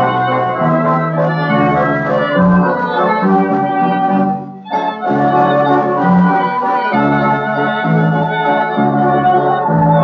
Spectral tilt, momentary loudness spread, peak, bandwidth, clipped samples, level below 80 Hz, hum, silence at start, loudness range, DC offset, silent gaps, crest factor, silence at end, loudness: -6 dB/octave; 4 LU; -2 dBFS; 6 kHz; under 0.1%; -48 dBFS; none; 0 s; 1 LU; under 0.1%; none; 12 dB; 0 s; -13 LUFS